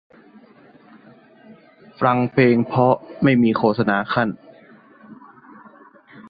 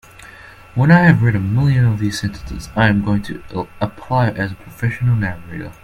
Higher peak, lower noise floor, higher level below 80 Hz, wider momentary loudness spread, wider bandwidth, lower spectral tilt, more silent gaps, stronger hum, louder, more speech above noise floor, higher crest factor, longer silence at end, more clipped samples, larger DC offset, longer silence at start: about the same, -2 dBFS vs 0 dBFS; first, -49 dBFS vs -40 dBFS; second, -58 dBFS vs -38 dBFS; second, 6 LU vs 15 LU; second, 5 kHz vs 13.5 kHz; first, -10.5 dB/octave vs -7.5 dB/octave; neither; neither; about the same, -18 LUFS vs -17 LUFS; first, 32 dB vs 24 dB; about the same, 18 dB vs 16 dB; about the same, 0.1 s vs 0.1 s; neither; neither; first, 2 s vs 0.2 s